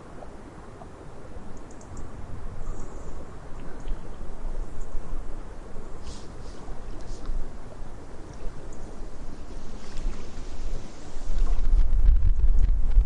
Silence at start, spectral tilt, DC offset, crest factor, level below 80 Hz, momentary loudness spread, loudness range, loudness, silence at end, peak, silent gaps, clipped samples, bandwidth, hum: 0.05 s; -6.5 dB/octave; under 0.1%; 16 dB; -26 dBFS; 18 LU; 11 LU; -35 LUFS; 0 s; -6 dBFS; none; under 0.1%; 7.8 kHz; none